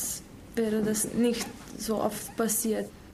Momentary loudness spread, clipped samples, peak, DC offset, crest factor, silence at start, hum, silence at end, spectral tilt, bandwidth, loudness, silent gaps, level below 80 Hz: 10 LU; under 0.1%; -14 dBFS; under 0.1%; 16 dB; 0 s; none; 0 s; -4 dB/octave; 15.5 kHz; -29 LUFS; none; -54 dBFS